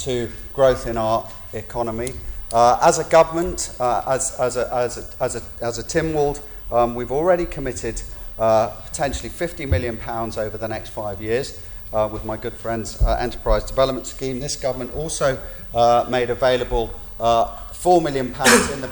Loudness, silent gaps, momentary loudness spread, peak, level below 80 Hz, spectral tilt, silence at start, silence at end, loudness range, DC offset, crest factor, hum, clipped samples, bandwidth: -21 LUFS; none; 11 LU; 0 dBFS; -34 dBFS; -4 dB/octave; 0 s; 0 s; 6 LU; under 0.1%; 20 dB; none; under 0.1%; 19.5 kHz